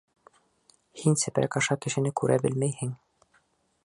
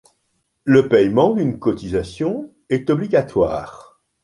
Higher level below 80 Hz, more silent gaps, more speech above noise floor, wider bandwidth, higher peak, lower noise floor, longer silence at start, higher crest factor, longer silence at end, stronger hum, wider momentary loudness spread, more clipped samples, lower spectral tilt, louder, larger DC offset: second, -66 dBFS vs -46 dBFS; neither; second, 42 dB vs 52 dB; about the same, 11.5 kHz vs 11 kHz; second, -10 dBFS vs -2 dBFS; about the same, -68 dBFS vs -69 dBFS; first, 0.95 s vs 0.65 s; about the same, 20 dB vs 16 dB; first, 0.9 s vs 0.4 s; neither; second, 9 LU vs 13 LU; neither; second, -5 dB/octave vs -7.5 dB/octave; second, -27 LUFS vs -18 LUFS; neither